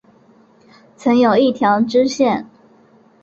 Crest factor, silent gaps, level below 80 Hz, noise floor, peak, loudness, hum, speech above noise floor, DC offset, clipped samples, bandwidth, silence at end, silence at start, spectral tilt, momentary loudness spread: 14 dB; none; -60 dBFS; -50 dBFS; -2 dBFS; -15 LUFS; none; 36 dB; under 0.1%; under 0.1%; 7.8 kHz; 0.75 s; 1 s; -5.5 dB/octave; 7 LU